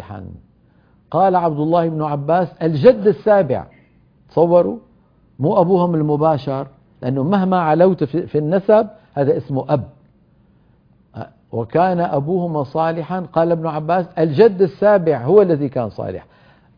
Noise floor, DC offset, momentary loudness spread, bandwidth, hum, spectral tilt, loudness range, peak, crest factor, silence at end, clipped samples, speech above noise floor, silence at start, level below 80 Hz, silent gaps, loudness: -54 dBFS; under 0.1%; 13 LU; 5.2 kHz; none; -10.5 dB/octave; 5 LU; 0 dBFS; 18 dB; 0.55 s; under 0.1%; 38 dB; 0 s; -54 dBFS; none; -17 LUFS